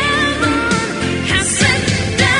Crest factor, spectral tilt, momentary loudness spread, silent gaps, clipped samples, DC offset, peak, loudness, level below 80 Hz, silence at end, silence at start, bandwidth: 14 dB; -3.5 dB/octave; 4 LU; none; under 0.1%; under 0.1%; 0 dBFS; -15 LUFS; -34 dBFS; 0 s; 0 s; 11.5 kHz